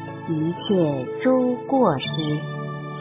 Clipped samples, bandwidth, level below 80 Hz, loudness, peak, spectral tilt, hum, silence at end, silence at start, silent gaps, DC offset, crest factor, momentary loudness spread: under 0.1%; 3.9 kHz; -60 dBFS; -23 LUFS; -6 dBFS; -11 dB/octave; none; 0 s; 0 s; none; under 0.1%; 16 dB; 9 LU